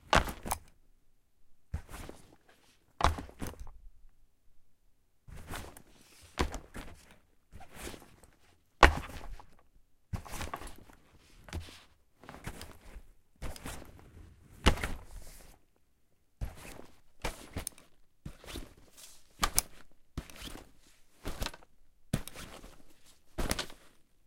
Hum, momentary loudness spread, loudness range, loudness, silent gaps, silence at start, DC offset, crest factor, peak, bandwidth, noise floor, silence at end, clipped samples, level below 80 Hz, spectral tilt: none; 25 LU; 13 LU; -36 LUFS; none; 0.05 s; under 0.1%; 36 dB; -2 dBFS; 16.5 kHz; -71 dBFS; 0.25 s; under 0.1%; -44 dBFS; -3.5 dB/octave